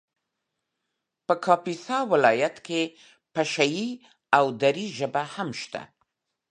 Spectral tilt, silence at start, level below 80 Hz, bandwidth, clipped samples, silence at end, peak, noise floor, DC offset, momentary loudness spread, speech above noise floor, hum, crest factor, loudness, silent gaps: -4.5 dB/octave; 1.3 s; -76 dBFS; 10.5 kHz; under 0.1%; 0.7 s; -2 dBFS; -82 dBFS; under 0.1%; 13 LU; 57 dB; none; 24 dB; -25 LUFS; none